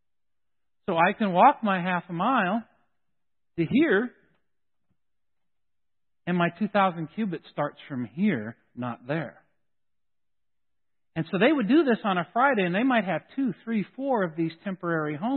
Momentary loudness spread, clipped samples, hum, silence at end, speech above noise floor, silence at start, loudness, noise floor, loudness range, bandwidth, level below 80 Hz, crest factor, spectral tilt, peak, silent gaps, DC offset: 13 LU; under 0.1%; none; 0 s; over 65 dB; 0.9 s; -26 LUFS; under -90 dBFS; 8 LU; 4.4 kHz; -72 dBFS; 20 dB; -10.5 dB/octave; -6 dBFS; none; under 0.1%